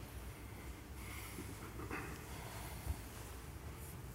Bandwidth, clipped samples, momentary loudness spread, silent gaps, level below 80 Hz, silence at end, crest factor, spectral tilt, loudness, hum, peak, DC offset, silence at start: 16 kHz; under 0.1%; 5 LU; none; -52 dBFS; 0 s; 18 dB; -4.5 dB/octave; -49 LUFS; none; -30 dBFS; under 0.1%; 0 s